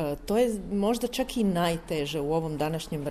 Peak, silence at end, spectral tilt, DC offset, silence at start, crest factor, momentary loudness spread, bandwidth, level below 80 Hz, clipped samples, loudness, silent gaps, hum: -12 dBFS; 0 s; -5.5 dB/octave; under 0.1%; 0 s; 16 dB; 5 LU; 14.5 kHz; -46 dBFS; under 0.1%; -28 LUFS; none; none